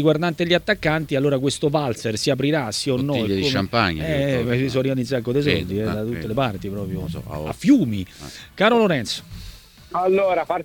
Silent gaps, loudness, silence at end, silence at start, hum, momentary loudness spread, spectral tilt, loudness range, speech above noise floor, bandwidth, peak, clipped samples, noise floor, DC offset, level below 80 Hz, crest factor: none; -21 LUFS; 0 s; 0 s; none; 11 LU; -5.5 dB/octave; 2 LU; 20 dB; 19 kHz; -2 dBFS; under 0.1%; -41 dBFS; under 0.1%; -44 dBFS; 18 dB